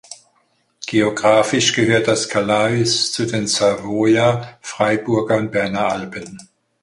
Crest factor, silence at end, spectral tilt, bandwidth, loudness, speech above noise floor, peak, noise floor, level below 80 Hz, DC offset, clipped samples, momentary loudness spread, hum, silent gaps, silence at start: 16 dB; 0.4 s; -4 dB/octave; 11.5 kHz; -17 LUFS; 45 dB; -2 dBFS; -63 dBFS; -54 dBFS; under 0.1%; under 0.1%; 11 LU; none; none; 0.1 s